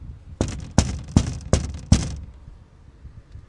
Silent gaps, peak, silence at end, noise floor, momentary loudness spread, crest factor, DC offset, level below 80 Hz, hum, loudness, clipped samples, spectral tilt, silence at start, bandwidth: none; 0 dBFS; 0.1 s; -47 dBFS; 19 LU; 24 dB; under 0.1%; -32 dBFS; none; -24 LUFS; under 0.1%; -5.5 dB/octave; 0 s; 11.5 kHz